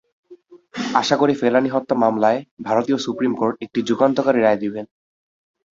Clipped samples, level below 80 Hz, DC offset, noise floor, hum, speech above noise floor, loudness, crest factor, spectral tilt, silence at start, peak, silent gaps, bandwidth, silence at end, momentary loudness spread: under 0.1%; -64 dBFS; under 0.1%; -47 dBFS; none; 28 dB; -19 LUFS; 20 dB; -5.5 dB/octave; 0.3 s; 0 dBFS; 2.51-2.57 s; 7.6 kHz; 0.9 s; 10 LU